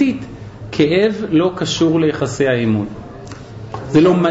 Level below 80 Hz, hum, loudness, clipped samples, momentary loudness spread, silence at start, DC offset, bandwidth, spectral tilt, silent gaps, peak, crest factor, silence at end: -44 dBFS; none; -16 LUFS; under 0.1%; 19 LU; 0 s; under 0.1%; 8 kHz; -6 dB/octave; none; -4 dBFS; 12 dB; 0 s